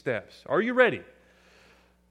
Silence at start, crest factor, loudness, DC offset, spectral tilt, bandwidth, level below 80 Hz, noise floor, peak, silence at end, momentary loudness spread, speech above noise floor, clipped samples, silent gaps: 0.05 s; 22 dB; -25 LUFS; under 0.1%; -6.5 dB/octave; 9.2 kHz; -68 dBFS; -60 dBFS; -6 dBFS; 1.1 s; 12 LU; 34 dB; under 0.1%; none